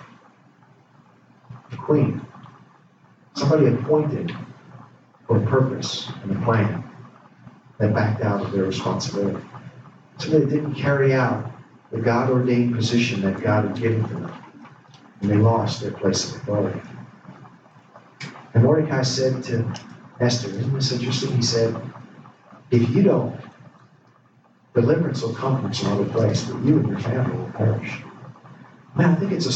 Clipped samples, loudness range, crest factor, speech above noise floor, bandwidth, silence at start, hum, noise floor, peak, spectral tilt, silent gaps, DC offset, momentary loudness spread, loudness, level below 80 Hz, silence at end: under 0.1%; 3 LU; 18 dB; 36 dB; 8.2 kHz; 0 s; none; -56 dBFS; -4 dBFS; -6.5 dB/octave; none; under 0.1%; 18 LU; -22 LUFS; -60 dBFS; 0 s